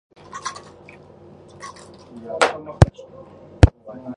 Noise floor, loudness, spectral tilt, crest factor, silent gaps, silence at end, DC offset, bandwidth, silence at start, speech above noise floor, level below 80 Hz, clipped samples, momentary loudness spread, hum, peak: -45 dBFS; -20 LUFS; -6 dB/octave; 22 dB; none; 0.05 s; under 0.1%; 11 kHz; 0.35 s; 24 dB; -28 dBFS; under 0.1%; 25 LU; none; 0 dBFS